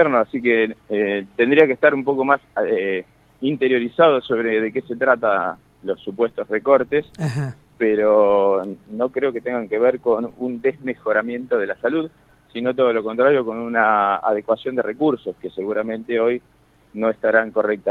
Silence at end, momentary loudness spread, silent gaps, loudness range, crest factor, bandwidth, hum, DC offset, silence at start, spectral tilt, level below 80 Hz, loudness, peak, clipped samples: 0 s; 11 LU; none; 3 LU; 18 dB; 9.2 kHz; none; under 0.1%; 0 s; -7.5 dB/octave; -62 dBFS; -20 LUFS; 0 dBFS; under 0.1%